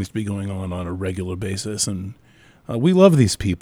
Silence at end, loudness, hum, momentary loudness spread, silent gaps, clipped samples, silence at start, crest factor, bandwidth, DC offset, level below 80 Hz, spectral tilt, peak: 0.05 s; -20 LUFS; none; 14 LU; none; under 0.1%; 0 s; 20 dB; 16 kHz; under 0.1%; -46 dBFS; -6 dB/octave; 0 dBFS